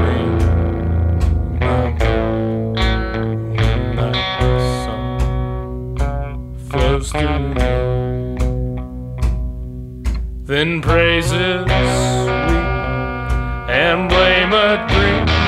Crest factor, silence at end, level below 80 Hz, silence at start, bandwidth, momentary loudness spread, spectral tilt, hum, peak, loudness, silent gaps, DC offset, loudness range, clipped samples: 16 dB; 0 s; -22 dBFS; 0 s; 12.5 kHz; 11 LU; -6 dB/octave; none; 0 dBFS; -17 LUFS; none; under 0.1%; 5 LU; under 0.1%